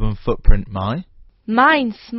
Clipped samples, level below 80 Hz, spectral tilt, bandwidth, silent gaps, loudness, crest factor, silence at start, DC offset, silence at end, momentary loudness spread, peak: under 0.1%; -20 dBFS; -4.5 dB/octave; 5.8 kHz; none; -18 LUFS; 16 dB; 0 s; under 0.1%; 0 s; 13 LU; 0 dBFS